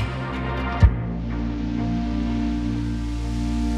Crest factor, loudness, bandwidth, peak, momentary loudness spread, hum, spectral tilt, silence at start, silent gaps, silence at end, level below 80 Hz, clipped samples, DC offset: 20 dB; -25 LUFS; 9.6 kHz; -2 dBFS; 8 LU; none; -7.5 dB/octave; 0 s; none; 0 s; -26 dBFS; under 0.1%; under 0.1%